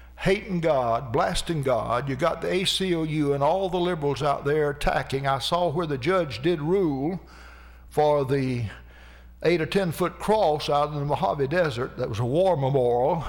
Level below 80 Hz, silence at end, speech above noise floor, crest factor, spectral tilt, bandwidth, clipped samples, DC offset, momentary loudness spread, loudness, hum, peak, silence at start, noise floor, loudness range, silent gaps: -44 dBFS; 0 s; 23 dB; 12 dB; -6 dB/octave; 18.5 kHz; under 0.1%; under 0.1%; 5 LU; -25 LUFS; none; -12 dBFS; 0 s; -47 dBFS; 2 LU; none